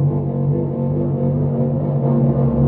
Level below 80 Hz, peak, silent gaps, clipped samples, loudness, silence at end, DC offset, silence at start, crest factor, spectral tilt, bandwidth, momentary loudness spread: -38 dBFS; -4 dBFS; none; under 0.1%; -18 LUFS; 0 s; under 0.1%; 0 s; 12 dB; -13.5 dB/octave; 2.3 kHz; 4 LU